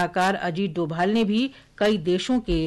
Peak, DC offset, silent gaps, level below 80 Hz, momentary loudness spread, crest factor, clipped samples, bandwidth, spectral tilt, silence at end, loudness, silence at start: -12 dBFS; under 0.1%; none; -42 dBFS; 5 LU; 10 dB; under 0.1%; 12.5 kHz; -6 dB/octave; 0 s; -24 LUFS; 0 s